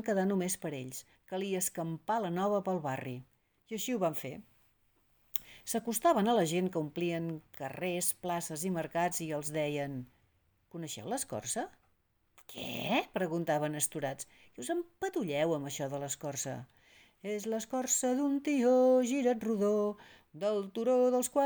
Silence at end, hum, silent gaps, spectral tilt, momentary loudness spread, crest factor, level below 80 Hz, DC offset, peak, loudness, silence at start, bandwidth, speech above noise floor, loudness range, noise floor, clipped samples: 0 s; none; none; -4.5 dB/octave; 15 LU; 24 dB; -72 dBFS; under 0.1%; -10 dBFS; -33 LUFS; 0 s; over 20 kHz; 41 dB; 7 LU; -74 dBFS; under 0.1%